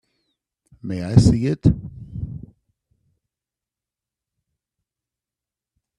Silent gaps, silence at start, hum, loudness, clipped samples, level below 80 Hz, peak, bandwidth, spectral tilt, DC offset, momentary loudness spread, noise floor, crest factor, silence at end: none; 0.85 s; none; -19 LUFS; under 0.1%; -40 dBFS; 0 dBFS; 11.5 kHz; -8 dB/octave; under 0.1%; 20 LU; -89 dBFS; 24 dB; 3.6 s